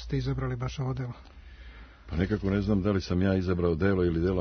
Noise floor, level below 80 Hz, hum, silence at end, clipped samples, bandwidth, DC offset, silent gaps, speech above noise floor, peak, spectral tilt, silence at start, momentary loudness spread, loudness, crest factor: -48 dBFS; -42 dBFS; none; 0 s; under 0.1%; 6.6 kHz; under 0.1%; none; 20 dB; -12 dBFS; -8 dB/octave; 0 s; 12 LU; -28 LUFS; 18 dB